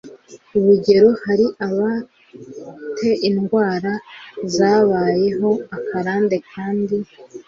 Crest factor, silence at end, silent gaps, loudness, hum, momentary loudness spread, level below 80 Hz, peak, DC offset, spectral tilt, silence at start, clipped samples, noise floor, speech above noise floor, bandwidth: 16 dB; 0.05 s; none; -18 LUFS; none; 17 LU; -58 dBFS; -2 dBFS; under 0.1%; -6.5 dB/octave; 0.05 s; under 0.1%; -41 dBFS; 24 dB; 7.6 kHz